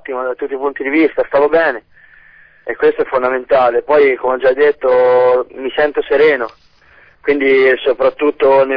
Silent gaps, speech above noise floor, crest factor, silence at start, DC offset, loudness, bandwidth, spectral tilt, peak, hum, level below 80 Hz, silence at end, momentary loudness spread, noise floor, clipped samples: none; 34 dB; 12 dB; 0.1 s; 0.2%; -13 LUFS; 5.2 kHz; -7 dB/octave; -2 dBFS; none; -48 dBFS; 0 s; 10 LU; -47 dBFS; under 0.1%